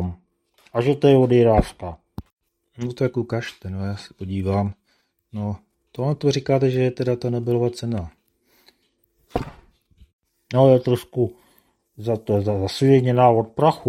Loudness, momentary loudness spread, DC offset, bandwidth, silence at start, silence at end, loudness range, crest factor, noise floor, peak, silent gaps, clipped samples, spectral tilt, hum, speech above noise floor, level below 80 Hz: -21 LUFS; 17 LU; under 0.1%; 13.5 kHz; 0 s; 0 s; 7 LU; 20 dB; -67 dBFS; -2 dBFS; 2.33-2.37 s, 10.13-10.19 s; under 0.1%; -7.5 dB/octave; none; 48 dB; -44 dBFS